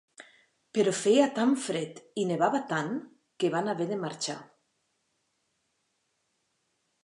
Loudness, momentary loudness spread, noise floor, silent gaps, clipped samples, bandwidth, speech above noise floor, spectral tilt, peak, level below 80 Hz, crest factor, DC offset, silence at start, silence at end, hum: -29 LUFS; 12 LU; -77 dBFS; none; under 0.1%; 11.5 kHz; 49 dB; -4.5 dB/octave; -10 dBFS; -84 dBFS; 22 dB; under 0.1%; 0.2 s; 2.6 s; none